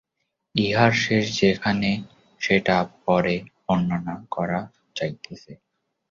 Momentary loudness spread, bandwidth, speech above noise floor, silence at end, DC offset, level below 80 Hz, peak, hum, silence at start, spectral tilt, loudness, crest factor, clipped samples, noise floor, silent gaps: 12 LU; 7.6 kHz; 56 dB; 0.55 s; under 0.1%; -54 dBFS; -4 dBFS; none; 0.55 s; -5.5 dB/octave; -23 LUFS; 20 dB; under 0.1%; -78 dBFS; none